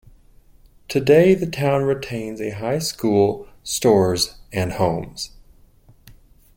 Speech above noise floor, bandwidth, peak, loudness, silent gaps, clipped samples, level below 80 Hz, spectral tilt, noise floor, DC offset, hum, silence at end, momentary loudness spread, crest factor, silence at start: 32 dB; 16.5 kHz; -2 dBFS; -20 LUFS; none; under 0.1%; -48 dBFS; -5 dB/octave; -51 dBFS; under 0.1%; none; 1.3 s; 14 LU; 18 dB; 0.9 s